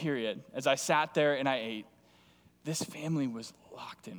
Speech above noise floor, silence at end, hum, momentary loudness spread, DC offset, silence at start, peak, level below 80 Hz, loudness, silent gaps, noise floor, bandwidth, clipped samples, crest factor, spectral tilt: 31 dB; 0 s; none; 17 LU; under 0.1%; 0 s; -12 dBFS; -78 dBFS; -32 LUFS; none; -63 dBFS; over 20 kHz; under 0.1%; 20 dB; -4 dB/octave